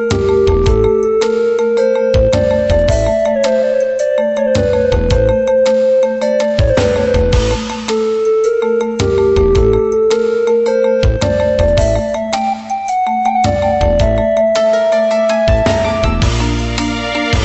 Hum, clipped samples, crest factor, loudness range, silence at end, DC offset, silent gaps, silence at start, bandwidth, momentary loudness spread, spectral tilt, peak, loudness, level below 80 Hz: none; under 0.1%; 12 dB; 1 LU; 0 s; under 0.1%; none; 0 s; 8.4 kHz; 5 LU; -6 dB/octave; 0 dBFS; -13 LUFS; -22 dBFS